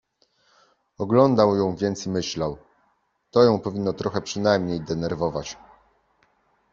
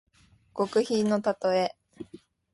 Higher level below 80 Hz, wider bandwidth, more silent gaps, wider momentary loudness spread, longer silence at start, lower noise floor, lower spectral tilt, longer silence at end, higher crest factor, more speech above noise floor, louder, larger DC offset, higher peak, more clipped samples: first, -56 dBFS vs -70 dBFS; second, 7.6 kHz vs 11.5 kHz; neither; second, 13 LU vs 21 LU; first, 1 s vs 0.55 s; first, -68 dBFS vs -59 dBFS; about the same, -6 dB/octave vs -5.5 dB/octave; first, 1.2 s vs 0.4 s; first, 22 dB vs 16 dB; first, 46 dB vs 33 dB; first, -23 LUFS vs -27 LUFS; neither; first, -2 dBFS vs -12 dBFS; neither